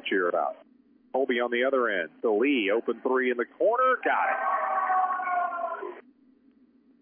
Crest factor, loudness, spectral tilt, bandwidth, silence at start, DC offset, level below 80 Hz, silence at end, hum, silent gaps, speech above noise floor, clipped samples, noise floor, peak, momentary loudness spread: 14 dB; -26 LUFS; -7.5 dB/octave; 3.6 kHz; 0 s; under 0.1%; -86 dBFS; 1 s; none; none; 35 dB; under 0.1%; -61 dBFS; -14 dBFS; 8 LU